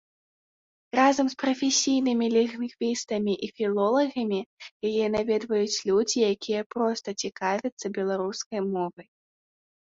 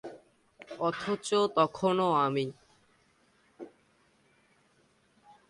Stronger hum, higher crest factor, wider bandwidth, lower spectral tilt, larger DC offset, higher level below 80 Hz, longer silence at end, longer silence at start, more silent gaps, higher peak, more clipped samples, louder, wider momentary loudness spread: neither; about the same, 20 dB vs 22 dB; second, 7.8 kHz vs 11.5 kHz; second, -3.5 dB/octave vs -5.5 dB/octave; neither; first, -68 dBFS vs -74 dBFS; second, 0.95 s vs 1.8 s; first, 0.95 s vs 0.05 s; first, 4.46-4.57 s, 4.71-4.80 s, 6.66-6.70 s, 7.72-7.77 s, 8.46-8.51 s vs none; first, -8 dBFS vs -12 dBFS; neither; first, -26 LUFS vs -29 LUFS; second, 8 LU vs 24 LU